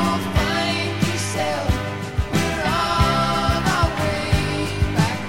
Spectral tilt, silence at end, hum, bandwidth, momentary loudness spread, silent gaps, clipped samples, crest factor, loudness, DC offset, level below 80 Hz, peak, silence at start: -5 dB/octave; 0 s; none; 16.5 kHz; 5 LU; none; under 0.1%; 16 dB; -21 LUFS; under 0.1%; -30 dBFS; -4 dBFS; 0 s